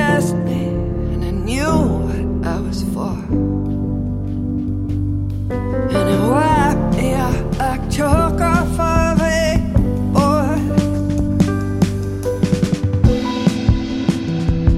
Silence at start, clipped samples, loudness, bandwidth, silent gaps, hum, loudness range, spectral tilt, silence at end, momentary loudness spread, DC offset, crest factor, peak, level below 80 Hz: 0 s; under 0.1%; -18 LUFS; 15 kHz; none; none; 4 LU; -7 dB/octave; 0 s; 6 LU; under 0.1%; 16 dB; 0 dBFS; -24 dBFS